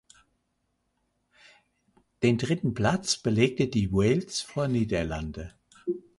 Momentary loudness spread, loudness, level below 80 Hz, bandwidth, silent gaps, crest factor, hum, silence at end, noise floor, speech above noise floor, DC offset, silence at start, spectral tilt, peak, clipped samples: 11 LU; -27 LUFS; -48 dBFS; 11.5 kHz; none; 20 dB; none; 0.2 s; -76 dBFS; 50 dB; under 0.1%; 2.2 s; -5.5 dB/octave; -10 dBFS; under 0.1%